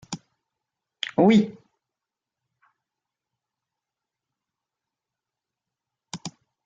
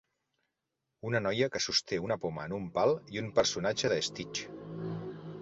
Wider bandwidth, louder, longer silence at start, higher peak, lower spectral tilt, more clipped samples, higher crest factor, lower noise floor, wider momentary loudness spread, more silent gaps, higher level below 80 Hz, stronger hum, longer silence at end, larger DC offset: about the same, 9 kHz vs 8.2 kHz; first, -21 LUFS vs -32 LUFS; second, 0.1 s vs 1.05 s; first, -8 dBFS vs -12 dBFS; first, -6 dB/octave vs -3.5 dB/octave; neither; about the same, 22 dB vs 22 dB; about the same, -88 dBFS vs -86 dBFS; first, 22 LU vs 11 LU; neither; second, -70 dBFS vs -64 dBFS; neither; first, 0.4 s vs 0 s; neither